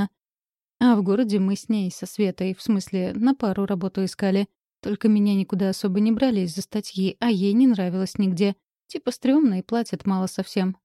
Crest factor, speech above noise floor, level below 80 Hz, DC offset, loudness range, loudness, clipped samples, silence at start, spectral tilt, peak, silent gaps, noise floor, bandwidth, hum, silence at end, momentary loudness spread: 16 dB; over 68 dB; -62 dBFS; under 0.1%; 2 LU; -23 LUFS; under 0.1%; 0 s; -6.5 dB/octave; -8 dBFS; none; under -90 dBFS; 13 kHz; none; 0.1 s; 10 LU